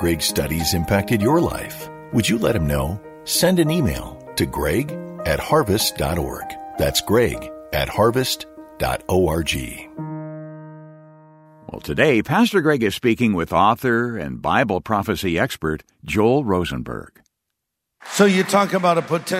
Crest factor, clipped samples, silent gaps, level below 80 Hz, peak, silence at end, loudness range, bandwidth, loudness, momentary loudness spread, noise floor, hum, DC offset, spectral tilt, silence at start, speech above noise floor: 20 dB; under 0.1%; none; -38 dBFS; -2 dBFS; 0 s; 4 LU; 16 kHz; -20 LUFS; 14 LU; -79 dBFS; none; under 0.1%; -5 dB/octave; 0 s; 60 dB